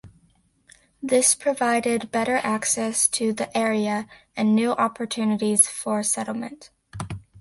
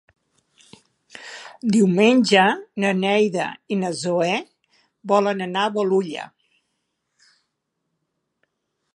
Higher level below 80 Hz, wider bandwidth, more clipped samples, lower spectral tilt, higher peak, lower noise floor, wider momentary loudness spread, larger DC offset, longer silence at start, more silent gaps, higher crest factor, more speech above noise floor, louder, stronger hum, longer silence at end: first, -58 dBFS vs -72 dBFS; about the same, 12 kHz vs 11.5 kHz; neither; second, -3 dB/octave vs -5 dB/octave; about the same, -2 dBFS vs -2 dBFS; second, -62 dBFS vs -77 dBFS; second, 16 LU vs 21 LU; neither; second, 0.05 s vs 1.15 s; neither; about the same, 22 dB vs 22 dB; second, 40 dB vs 57 dB; about the same, -22 LUFS vs -20 LUFS; neither; second, 0 s vs 2.7 s